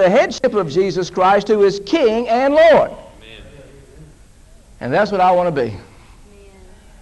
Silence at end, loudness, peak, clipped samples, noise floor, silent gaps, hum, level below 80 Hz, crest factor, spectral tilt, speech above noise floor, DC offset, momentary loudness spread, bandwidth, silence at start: 1.2 s; -15 LUFS; -4 dBFS; under 0.1%; -44 dBFS; none; none; -46 dBFS; 14 dB; -5.5 dB/octave; 30 dB; under 0.1%; 12 LU; 11.5 kHz; 0 s